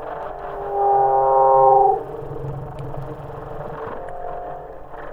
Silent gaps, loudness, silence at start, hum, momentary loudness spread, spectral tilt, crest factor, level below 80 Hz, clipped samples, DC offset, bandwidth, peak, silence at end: none; -18 LUFS; 0 s; none; 20 LU; -9 dB/octave; 18 dB; -42 dBFS; under 0.1%; under 0.1%; 3.9 kHz; -4 dBFS; 0 s